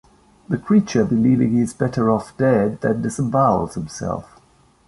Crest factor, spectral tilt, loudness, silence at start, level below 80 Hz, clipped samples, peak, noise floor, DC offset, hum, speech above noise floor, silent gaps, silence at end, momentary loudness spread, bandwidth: 16 dB; -7.5 dB/octave; -19 LUFS; 0.5 s; -48 dBFS; under 0.1%; -4 dBFS; -54 dBFS; under 0.1%; none; 36 dB; none; 0.65 s; 11 LU; 11.5 kHz